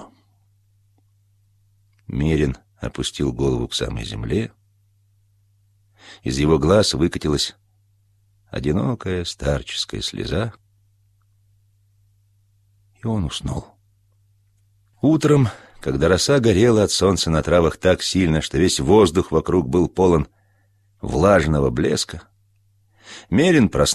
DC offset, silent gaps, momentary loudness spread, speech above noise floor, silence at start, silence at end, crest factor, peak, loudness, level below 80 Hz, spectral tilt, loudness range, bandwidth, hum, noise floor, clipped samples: under 0.1%; none; 14 LU; 42 dB; 0 s; 0 s; 18 dB; -4 dBFS; -19 LUFS; -36 dBFS; -5.5 dB/octave; 13 LU; 14 kHz; none; -60 dBFS; under 0.1%